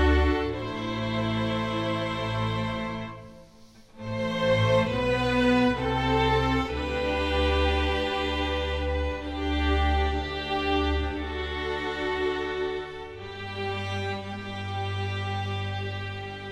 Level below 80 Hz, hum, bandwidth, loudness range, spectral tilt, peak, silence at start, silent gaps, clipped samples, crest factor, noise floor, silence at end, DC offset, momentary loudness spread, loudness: -34 dBFS; none; 10 kHz; 7 LU; -6.5 dB/octave; -10 dBFS; 0 s; none; under 0.1%; 16 dB; -52 dBFS; 0 s; under 0.1%; 11 LU; -27 LUFS